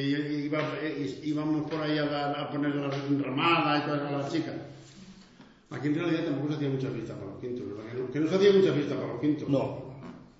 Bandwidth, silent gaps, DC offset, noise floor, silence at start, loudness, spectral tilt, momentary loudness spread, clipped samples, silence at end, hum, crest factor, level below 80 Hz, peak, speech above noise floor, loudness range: 8 kHz; none; under 0.1%; -55 dBFS; 0 s; -29 LUFS; -7 dB/octave; 15 LU; under 0.1%; 0.1 s; none; 18 dB; -66 dBFS; -10 dBFS; 26 dB; 5 LU